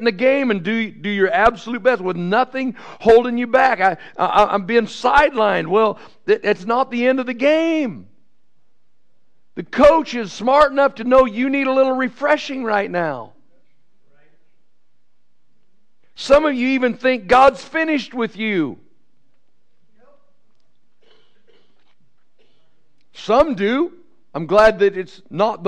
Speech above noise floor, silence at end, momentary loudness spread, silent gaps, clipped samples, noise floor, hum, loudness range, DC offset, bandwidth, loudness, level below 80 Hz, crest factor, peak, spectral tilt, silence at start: 56 dB; 0 s; 12 LU; none; under 0.1%; -73 dBFS; none; 9 LU; 0.6%; 10 kHz; -17 LUFS; -44 dBFS; 16 dB; -2 dBFS; -5.5 dB/octave; 0 s